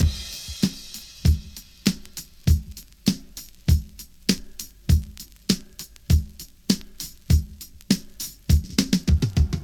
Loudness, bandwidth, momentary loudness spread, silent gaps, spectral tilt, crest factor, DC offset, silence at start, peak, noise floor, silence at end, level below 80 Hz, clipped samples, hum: -25 LUFS; 18 kHz; 17 LU; none; -5 dB/octave; 22 dB; under 0.1%; 0 s; -2 dBFS; -42 dBFS; 0 s; -28 dBFS; under 0.1%; none